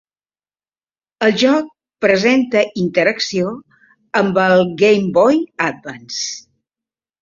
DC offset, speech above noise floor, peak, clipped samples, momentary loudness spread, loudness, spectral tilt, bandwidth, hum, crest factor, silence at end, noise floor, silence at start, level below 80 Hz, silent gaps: under 0.1%; over 75 dB; -2 dBFS; under 0.1%; 12 LU; -15 LUFS; -4.5 dB/octave; 7.6 kHz; none; 16 dB; 0.8 s; under -90 dBFS; 1.2 s; -58 dBFS; none